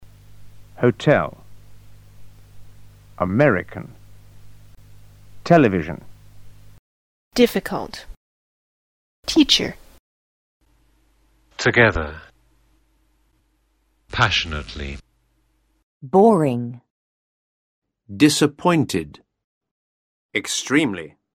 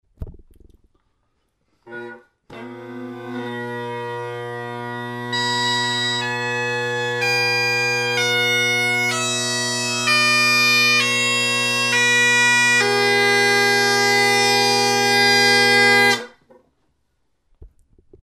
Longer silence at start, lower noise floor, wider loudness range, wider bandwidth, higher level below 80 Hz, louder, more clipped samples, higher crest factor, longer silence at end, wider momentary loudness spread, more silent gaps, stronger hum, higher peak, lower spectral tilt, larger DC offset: second, 0 s vs 0.2 s; second, -65 dBFS vs -70 dBFS; second, 5 LU vs 16 LU; first, 17.5 kHz vs 15.5 kHz; first, -46 dBFS vs -52 dBFS; second, -19 LUFS vs -16 LUFS; neither; first, 22 dB vs 16 dB; second, 0.25 s vs 0.6 s; first, 20 LU vs 16 LU; first, 6.79-7.31 s, 8.17-9.23 s, 9.99-10.60 s, 15.83-16.00 s, 16.90-17.82 s, 19.44-19.61 s, 19.71-20.29 s vs none; neither; first, 0 dBFS vs -4 dBFS; first, -4.5 dB/octave vs -2 dB/octave; neither